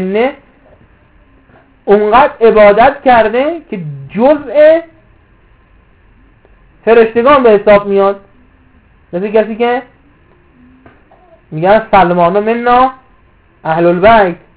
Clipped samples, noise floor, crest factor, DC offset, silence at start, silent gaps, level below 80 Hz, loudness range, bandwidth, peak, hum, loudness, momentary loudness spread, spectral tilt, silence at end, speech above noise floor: 1%; -47 dBFS; 10 dB; under 0.1%; 0 s; none; -42 dBFS; 6 LU; 4 kHz; 0 dBFS; none; -9 LUFS; 14 LU; -10 dB/octave; 0.2 s; 38 dB